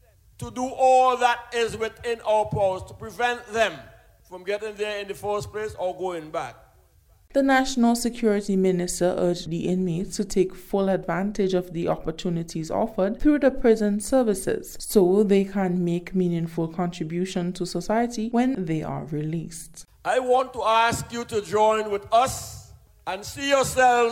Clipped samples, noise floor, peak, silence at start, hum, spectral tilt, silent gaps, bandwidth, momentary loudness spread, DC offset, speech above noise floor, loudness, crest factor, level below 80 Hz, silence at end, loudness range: under 0.1%; -57 dBFS; -6 dBFS; 0.4 s; none; -5 dB/octave; none; 17 kHz; 11 LU; under 0.1%; 34 dB; -24 LUFS; 18 dB; -46 dBFS; 0 s; 5 LU